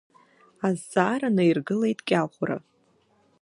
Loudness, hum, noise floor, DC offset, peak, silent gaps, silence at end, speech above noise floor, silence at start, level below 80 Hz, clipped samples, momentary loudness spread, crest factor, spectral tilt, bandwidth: -25 LUFS; none; -65 dBFS; under 0.1%; -6 dBFS; none; 0.85 s; 40 dB; 0.6 s; -72 dBFS; under 0.1%; 9 LU; 20 dB; -6.5 dB/octave; 11.5 kHz